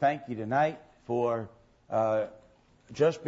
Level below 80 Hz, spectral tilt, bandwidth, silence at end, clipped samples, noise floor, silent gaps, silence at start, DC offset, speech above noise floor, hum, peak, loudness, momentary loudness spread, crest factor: -68 dBFS; -7 dB/octave; 8 kHz; 0 s; under 0.1%; -60 dBFS; none; 0 s; under 0.1%; 32 dB; none; -14 dBFS; -30 LUFS; 16 LU; 16 dB